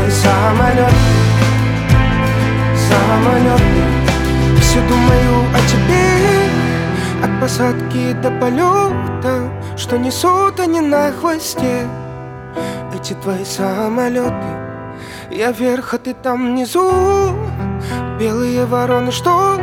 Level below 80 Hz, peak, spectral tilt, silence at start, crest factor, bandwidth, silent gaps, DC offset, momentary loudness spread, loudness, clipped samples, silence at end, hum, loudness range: -26 dBFS; 0 dBFS; -6 dB/octave; 0 s; 14 dB; 17 kHz; none; under 0.1%; 12 LU; -14 LUFS; under 0.1%; 0 s; none; 7 LU